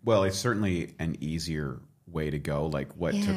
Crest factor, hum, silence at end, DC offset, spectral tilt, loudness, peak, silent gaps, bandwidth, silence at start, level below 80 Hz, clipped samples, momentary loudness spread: 18 dB; none; 0 s; under 0.1%; -6 dB/octave; -30 LUFS; -10 dBFS; none; 15.5 kHz; 0.05 s; -48 dBFS; under 0.1%; 9 LU